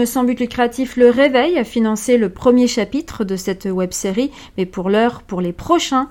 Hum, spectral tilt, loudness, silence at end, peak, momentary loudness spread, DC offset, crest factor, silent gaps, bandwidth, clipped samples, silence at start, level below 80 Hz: none; -5 dB/octave; -17 LUFS; 0 s; 0 dBFS; 10 LU; under 0.1%; 16 dB; none; 17 kHz; under 0.1%; 0 s; -44 dBFS